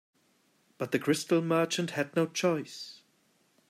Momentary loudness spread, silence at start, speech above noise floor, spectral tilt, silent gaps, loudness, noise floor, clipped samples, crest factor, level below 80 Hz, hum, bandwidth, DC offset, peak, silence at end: 14 LU; 0.8 s; 40 dB; -5 dB/octave; none; -30 LUFS; -69 dBFS; under 0.1%; 18 dB; -78 dBFS; none; 15.5 kHz; under 0.1%; -14 dBFS; 0.75 s